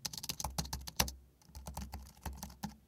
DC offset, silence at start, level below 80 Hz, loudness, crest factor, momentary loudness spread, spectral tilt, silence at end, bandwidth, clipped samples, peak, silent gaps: under 0.1%; 0 s; -50 dBFS; -41 LUFS; 34 dB; 15 LU; -2.5 dB/octave; 0 s; 18 kHz; under 0.1%; -8 dBFS; none